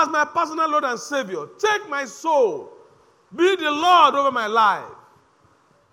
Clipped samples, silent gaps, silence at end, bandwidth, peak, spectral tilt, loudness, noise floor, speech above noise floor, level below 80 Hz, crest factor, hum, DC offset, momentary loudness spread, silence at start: under 0.1%; none; 1 s; 16 kHz; -4 dBFS; -2.5 dB/octave; -20 LUFS; -58 dBFS; 38 dB; -74 dBFS; 18 dB; none; under 0.1%; 13 LU; 0 s